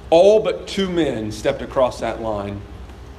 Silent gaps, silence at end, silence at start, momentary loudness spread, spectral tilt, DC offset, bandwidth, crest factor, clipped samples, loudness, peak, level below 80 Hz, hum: none; 0 s; 0 s; 18 LU; -5.5 dB/octave; under 0.1%; 13 kHz; 18 dB; under 0.1%; -19 LUFS; -2 dBFS; -40 dBFS; none